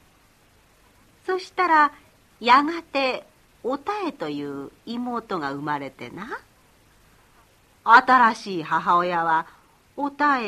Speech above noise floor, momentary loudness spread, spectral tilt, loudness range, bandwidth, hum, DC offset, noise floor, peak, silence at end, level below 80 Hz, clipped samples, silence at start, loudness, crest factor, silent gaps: 36 dB; 19 LU; -4.5 dB/octave; 11 LU; 14 kHz; none; under 0.1%; -58 dBFS; -2 dBFS; 0 s; -64 dBFS; under 0.1%; 1.25 s; -22 LUFS; 22 dB; none